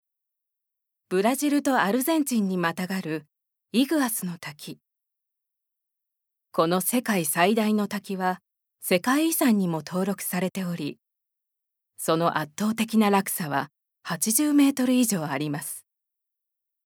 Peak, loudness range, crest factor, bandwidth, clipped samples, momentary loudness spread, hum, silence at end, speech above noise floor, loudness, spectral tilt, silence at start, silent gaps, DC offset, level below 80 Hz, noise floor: -4 dBFS; 6 LU; 22 dB; over 20 kHz; under 0.1%; 13 LU; none; 1.05 s; 60 dB; -25 LUFS; -4.5 dB/octave; 1.1 s; none; under 0.1%; -80 dBFS; -84 dBFS